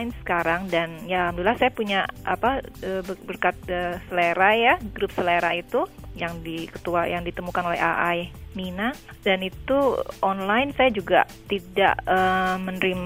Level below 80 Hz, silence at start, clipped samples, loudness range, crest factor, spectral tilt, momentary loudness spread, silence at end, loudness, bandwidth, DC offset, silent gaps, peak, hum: -46 dBFS; 0 s; under 0.1%; 4 LU; 20 dB; -5.5 dB/octave; 11 LU; 0 s; -24 LUFS; 16 kHz; under 0.1%; none; -4 dBFS; none